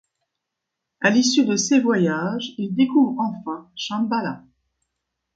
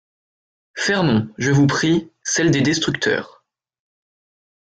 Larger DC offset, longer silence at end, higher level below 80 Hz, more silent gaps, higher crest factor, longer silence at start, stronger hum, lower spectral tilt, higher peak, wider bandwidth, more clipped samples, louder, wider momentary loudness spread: neither; second, 0.95 s vs 1.45 s; second, -68 dBFS vs -54 dBFS; neither; about the same, 20 dB vs 16 dB; first, 1 s vs 0.75 s; neither; about the same, -4 dB/octave vs -4.5 dB/octave; first, -2 dBFS vs -6 dBFS; about the same, 9 kHz vs 9.2 kHz; neither; second, -21 LUFS vs -18 LUFS; first, 13 LU vs 6 LU